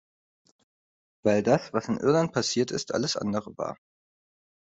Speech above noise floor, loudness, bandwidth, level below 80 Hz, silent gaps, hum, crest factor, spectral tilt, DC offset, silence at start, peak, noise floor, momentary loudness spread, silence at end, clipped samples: over 64 dB; -27 LUFS; 8.2 kHz; -66 dBFS; none; none; 20 dB; -5 dB/octave; under 0.1%; 1.25 s; -8 dBFS; under -90 dBFS; 12 LU; 1 s; under 0.1%